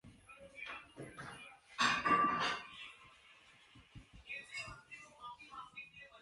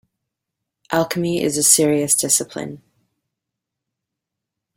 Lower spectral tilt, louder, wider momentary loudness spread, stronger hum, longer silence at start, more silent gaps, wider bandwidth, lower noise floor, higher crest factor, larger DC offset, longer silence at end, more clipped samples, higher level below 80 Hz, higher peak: about the same, -2.5 dB/octave vs -3 dB/octave; second, -38 LUFS vs -16 LUFS; first, 26 LU vs 16 LU; neither; second, 0.05 s vs 0.9 s; neither; second, 11.5 kHz vs 16.5 kHz; second, -64 dBFS vs -83 dBFS; about the same, 22 dB vs 22 dB; neither; second, 0 s vs 2 s; neither; second, -70 dBFS vs -60 dBFS; second, -20 dBFS vs 0 dBFS